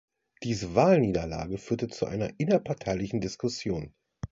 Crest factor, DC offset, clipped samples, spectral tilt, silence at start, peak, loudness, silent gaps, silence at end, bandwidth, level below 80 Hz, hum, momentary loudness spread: 22 dB; under 0.1%; under 0.1%; -6.5 dB/octave; 0.4 s; -8 dBFS; -29 LUFS; none; 0.05 s; 7.8 kHz; -50 dBFS; none; 13 LU